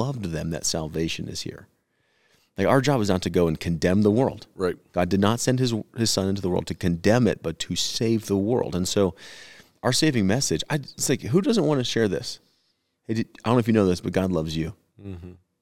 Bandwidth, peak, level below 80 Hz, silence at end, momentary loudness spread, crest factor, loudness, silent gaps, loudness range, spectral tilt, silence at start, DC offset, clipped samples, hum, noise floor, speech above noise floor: 16.5 kHz; -4 dBFS; -52 dBFS; 0.25 s; 12 LU; 20 dB; -24 LUFS; none; 2 LU; -5 dB/octave; 0 s; 0.3%; under 0.1%; none; -71 dBFS; 47 dB